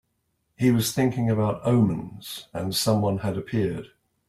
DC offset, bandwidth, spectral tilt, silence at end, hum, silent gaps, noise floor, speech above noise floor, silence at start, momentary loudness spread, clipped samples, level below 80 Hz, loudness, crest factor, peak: under 0.1%; 16 kHz; -6 dB/octave; 0.4 s; none; none; -74 dBFS; 50 dB; 0.6 s; 12 LU; under 0.1%; -56 dBFS; -24 LUFS; 16 dB; -8 dBFS